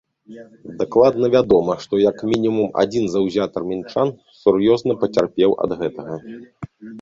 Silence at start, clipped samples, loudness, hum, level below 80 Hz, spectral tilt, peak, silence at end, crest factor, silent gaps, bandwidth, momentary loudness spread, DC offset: 0.3 s; under 0.1%; -18 LUFS; none; -52 dBFS; -7 dB/octave; -2 dBFS; 0 s; 16 dB; none; 7.6 kHz; 19 LU; under 0.1%